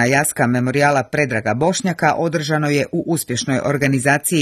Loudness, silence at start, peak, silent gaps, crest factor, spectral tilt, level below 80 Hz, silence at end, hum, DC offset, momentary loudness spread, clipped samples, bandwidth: -17 LUFS; 0 s; 0 dBFS; none; 16 dB; -5 dB/octave; -54 dBFS; 0 s; none; under 0.1%; 4 LU; under 0.1%; 14 kHz